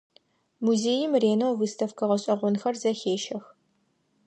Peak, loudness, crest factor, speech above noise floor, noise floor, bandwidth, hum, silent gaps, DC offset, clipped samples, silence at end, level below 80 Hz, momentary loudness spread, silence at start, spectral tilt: -10 dBFS; -26 LUFS; 16 dB; 45 dB; -71 dBFS; 9.4 kHz; none; none; under 0.1%; under 0.1%; 0.85 s; -78 dBFS; 7 LU; 0.6 s; -5 dB/octave